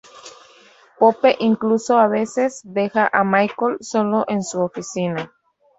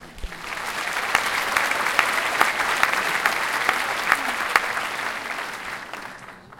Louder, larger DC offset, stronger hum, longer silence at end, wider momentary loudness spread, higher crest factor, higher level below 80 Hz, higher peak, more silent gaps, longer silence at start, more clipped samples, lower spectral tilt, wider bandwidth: first, -19 LUFS vs -22 LUFS; neither; neither; first, 0.55 s vs 0 s; second, 8 LU vs 13 LU; second, 18 dB vs 24 dB; second, -64 dBFS vs -48 dBFS; about the same, -2 dBFS vs 0 dBFS; neither; first, 0.15 s vs 0 s; neither; first, -5.5 dB/octave vs -1 dB/octave; second, 8.2 kHz vs 17 kHz